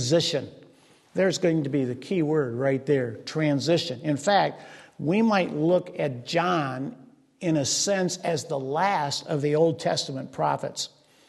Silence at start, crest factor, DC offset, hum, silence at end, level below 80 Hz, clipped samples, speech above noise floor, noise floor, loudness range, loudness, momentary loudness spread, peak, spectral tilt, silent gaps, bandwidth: 0 s; 18 dB; under 0.1%; none; 0.4 s; -70 dBFS; under 0.1%; 32 dB; -57 dBFS; 2 LU; -25 LUFS; 10 LU; -8 dBFS; -4.5 dB/octave; none; 12.5 kHz